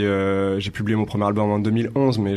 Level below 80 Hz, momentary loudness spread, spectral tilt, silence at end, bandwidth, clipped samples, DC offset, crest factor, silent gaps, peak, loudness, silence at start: -52 dBFS; 3 LU; -7.5 dB/octave; 0 s; 12 kHz; under 0.1%; under 0.1%; 14 dB; none; -6 dBFS; -21 LUFS; 0 s